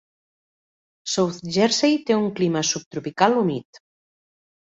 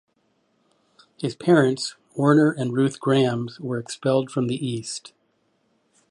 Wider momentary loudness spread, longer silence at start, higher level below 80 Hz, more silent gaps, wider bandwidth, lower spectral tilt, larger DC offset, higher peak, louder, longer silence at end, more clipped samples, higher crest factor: about the same, 10 LU vs 12 LU; second, 1.05 s vs 1.2 s; about the same, -64 dBFS vs -68 dBFS; first, 2.86-2.91 s vs none; second, 8.2 kHz vs 11.5 kHz; second, -4 dB/octave vs -6 dB/octave; neither; about the same, -2 dBFS vs -4 dBFS; about the same, -21 LUFS vs -22 LUFS; about the same, 1.05 s vs 1.1 s; neither; about the same, 22 dB vs 20 dB